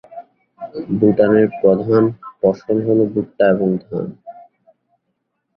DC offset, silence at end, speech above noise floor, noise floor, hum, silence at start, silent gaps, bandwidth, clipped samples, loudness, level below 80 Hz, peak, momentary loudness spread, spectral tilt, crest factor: under 0.1%; 1.15 s; 57 dB; -72 dBFS; none; 0.1 s; none; 6 kHz; under 0.1%; -16 LUFS; -54 dBFS; 0 dBFS; 14 LU; -10.5 dB/octave; 16 dB